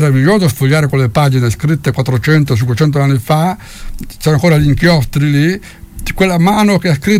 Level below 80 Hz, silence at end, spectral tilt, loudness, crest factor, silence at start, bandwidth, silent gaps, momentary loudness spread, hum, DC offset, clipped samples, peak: -30 dBFS; 0 s; -6.5 dB/octave; -12 LUFS; 10 dB; 0 s; 16 kHz; none; 13 LU; none; under 0.1%; under 0.1%; 0 dBFS